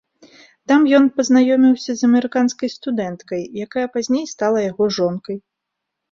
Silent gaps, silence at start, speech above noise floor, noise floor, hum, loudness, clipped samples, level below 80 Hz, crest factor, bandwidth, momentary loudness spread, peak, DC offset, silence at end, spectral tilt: none; 0.7 s; 63 dB; -80 dBFS; none; -17 LUFS; under 0.1%; -62 dBFS; 16 dB; 7.6 kHz; 13 LU; -2 dBFS; under 0.1%; 0.75 s; -5 dB/octave